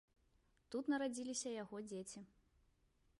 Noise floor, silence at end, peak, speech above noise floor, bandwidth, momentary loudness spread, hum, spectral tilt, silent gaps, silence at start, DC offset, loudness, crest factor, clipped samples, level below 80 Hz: -77 dBFS; 0.95 s; -30 dBFS; 33 dB; 11.5 kHz; 14 LU; none; -3.5 dB/octave; none; 0.7 s; under 0.1%; -45 LUFS; 18 dB; under 0.1%; -78 dBFS